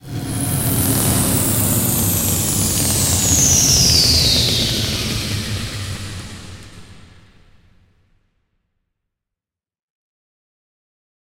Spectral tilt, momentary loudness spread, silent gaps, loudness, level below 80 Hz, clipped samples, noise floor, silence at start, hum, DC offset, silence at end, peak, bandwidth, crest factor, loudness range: -2.5 dB/octave; 16 LU; none; -15 LUFS; -34 dBFS; under 0.1%; -88 dBFS; 0.05 s; none; under 0.1%; 4.25 s; -2 dBFS; 16.5 kHz; 18 dB; 16 LU